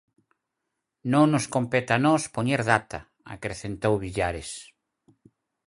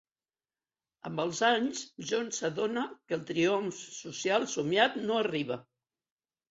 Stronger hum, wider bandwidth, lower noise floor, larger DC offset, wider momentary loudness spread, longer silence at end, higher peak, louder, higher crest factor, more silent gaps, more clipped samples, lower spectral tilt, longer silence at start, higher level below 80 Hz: neither; first, 11.5 kHz vs 8 kHz; second, -82 dBFS vs under -90 dBFS; neither; first, 17 LU vs 12 LU; first, 1.05 s vs 0.9 s; first, -4 dBFS vs -10 dBFS; first, -25 LUFS vs -31 LUFS; about the same, 24 dB vs 22 dB; neither; neither; first, -5.5 dB/octave vs -3.5 dB/octave; about the same, 1.05 s vs 1.05 s; first, -52 dBFS vs -76 dBFS